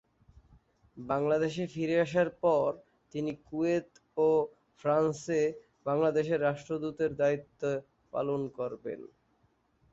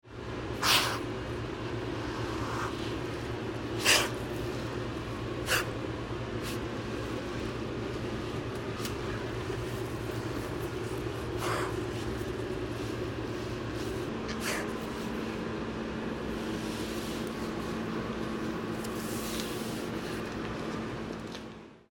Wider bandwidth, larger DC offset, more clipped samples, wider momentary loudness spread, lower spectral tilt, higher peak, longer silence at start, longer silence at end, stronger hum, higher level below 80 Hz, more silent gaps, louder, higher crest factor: second, 8 kHz vs 18 kHz; neither; neither; first, 12 LU vs 7 LU; first, -6.5 dB/octave vs -4 dB/octave; second, -14 dBFS vs -8 dBFS; first, 0.95 s vs 0.05 s; first, 0.85 s vs 0.1 s; neither; second, -68 dBFS vs -48 dBFS; neither; first, -31 LUFS vs -34 LUFS; second, 18 dB vs 26 dB